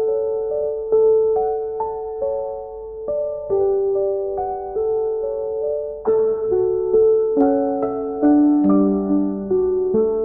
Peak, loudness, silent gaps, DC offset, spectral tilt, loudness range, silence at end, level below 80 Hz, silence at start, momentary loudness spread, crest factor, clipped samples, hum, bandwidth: -4 dBFS; -19 LUFS; none; 0.1%; -14 dB/octave; 5 LU; 0 s; -48 dBFS; 0 s; 9 LU; 14 dB; under 0.1%; none; 2.1 kHz